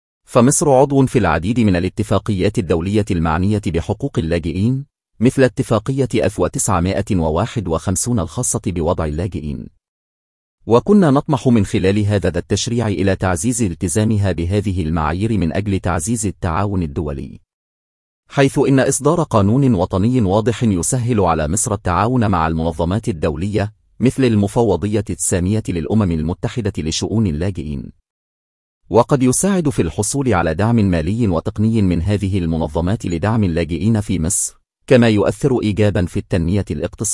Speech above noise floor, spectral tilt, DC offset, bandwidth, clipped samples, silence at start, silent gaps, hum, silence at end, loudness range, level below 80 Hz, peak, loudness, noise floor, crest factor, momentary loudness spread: over 74 dB; -6 dB/octave; under 0.1%; 12 kHz; under 0.1%; 0.3 s; 9.88-10.58 s, 17.53-18.23 s, 28.10-28.81 s; none; 0 s; 4 LU; -38 dBFS; 0 dBFS; -17 LUFS; under -90 dBFS; 16 dB; 7 LU